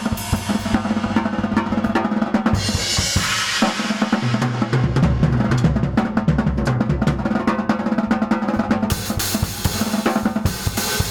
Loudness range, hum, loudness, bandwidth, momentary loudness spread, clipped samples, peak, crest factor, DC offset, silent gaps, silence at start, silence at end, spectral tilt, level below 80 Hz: 2 LU; none; -20 LUFS; 19 kHz; 4 LU; under 0.1%; -2 dBFS; 18 dB; under 0.1%; none; 0 s; 0 s; -5 dB/octave; -32 dBFS